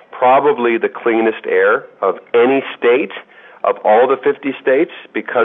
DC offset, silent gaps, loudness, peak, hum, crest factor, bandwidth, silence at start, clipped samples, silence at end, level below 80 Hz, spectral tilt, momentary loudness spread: under 0.1%; none; -15 LUFS; -2 dBFS; none; 12 dB; 3.9 kHz; 0.15 s; under 0.1%; 0 s; -74 dBFS; -8.5 dB/octave; 8 LU